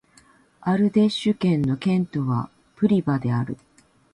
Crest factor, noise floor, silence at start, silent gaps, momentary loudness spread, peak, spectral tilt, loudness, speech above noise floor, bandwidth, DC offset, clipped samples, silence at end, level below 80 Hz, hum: 16 dB; -56 dBFS; 0.6 s; none; 11 LU; -8 dBFS; -8 dB/octave; -23 LUFS; 35 dB; 11 kHz; under 0.1%; under 0.1%; 0.6 s; -58 dBFS; none